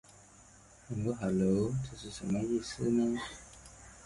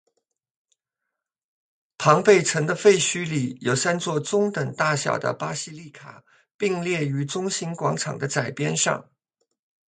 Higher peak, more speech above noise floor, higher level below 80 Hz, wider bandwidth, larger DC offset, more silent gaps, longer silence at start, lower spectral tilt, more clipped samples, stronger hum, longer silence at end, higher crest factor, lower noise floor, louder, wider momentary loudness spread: second, -18 dBFS vs -2 dBFS; second, 26 dB vs 61 dB; first, -58 dBFS vs -68 dBFS; first, 11.5 kHz vs 9.6 kHz; neither; second, none vs 6.54-6.59 s; second, 0.4 s vs 2 s; first, -6.5 dB/octave vs -4 dB/octave; neither; neither; second, 0 s vs 0.9 s; second, 16 dB vs 22 dB; second, -58 dBFS vs -84 dBFS; second, -34 LUFS vs -23 LUFS; first, 19 LU vs 10 LU